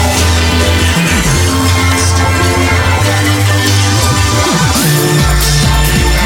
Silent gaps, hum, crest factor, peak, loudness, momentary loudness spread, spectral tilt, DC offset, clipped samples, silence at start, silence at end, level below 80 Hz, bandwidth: none; none; 10 dB; 0 dBFS; -10 LUFS; 1 LU; -4 dB/octave; under 0.1%; under 0.1%; 0 s; 0 s; -18 dBFS; 18 kHz